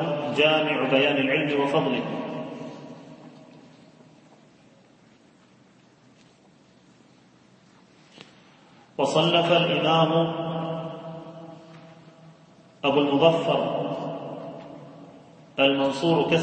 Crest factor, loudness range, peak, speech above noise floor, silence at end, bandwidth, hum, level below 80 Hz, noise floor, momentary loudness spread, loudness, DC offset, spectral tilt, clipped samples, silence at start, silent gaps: 22 dB; 9 LU; -4 dBFS; 35 dB; 0 s; 8.8 kHz; none; -70 dBFS; -56 dBFS; 22 LU; -23 LUFS; under 0.1%; -6 dB/octave; under 0.1%; 0 s; none